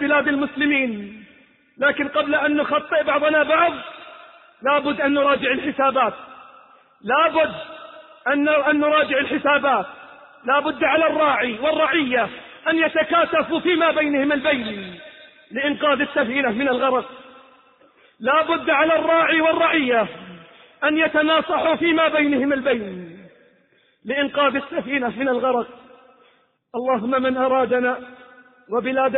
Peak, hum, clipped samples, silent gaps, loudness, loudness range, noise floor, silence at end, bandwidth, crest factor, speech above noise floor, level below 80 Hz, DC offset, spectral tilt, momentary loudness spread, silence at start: -6 dBFS; none; under 0.1%; none; -19 LUFS; 4 LU; -60 dBFS; 0 s; 4.2 kHz; 16 dB; 40 dB; -60 dBFS; under 0.1%; -9 dB/octave; 14 LU; 0 s